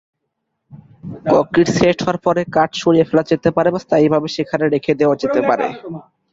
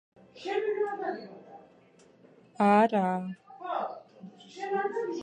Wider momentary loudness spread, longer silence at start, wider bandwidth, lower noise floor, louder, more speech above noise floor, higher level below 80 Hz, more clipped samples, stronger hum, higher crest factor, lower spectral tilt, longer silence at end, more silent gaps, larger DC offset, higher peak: second, 11 LU vs 24 LU; first, 0.7 s vs 0.35 s; second, 7.8 kHz vs 9.6 kHz; first, -74 dBFS vs -59 dBFS; first, -16 LUFS vs -29 LUFS; first, 58 dB vs 31 dB; first, -50 dBFS vs -80 dBFS; neither; neither; second, 16 dB vs 22 dB; about the same, -6 dB/octave vs -7 dB/octave; first, 0.3 s vs 0 s; neither; neither; first, 0 dBFS vs -10 dBFS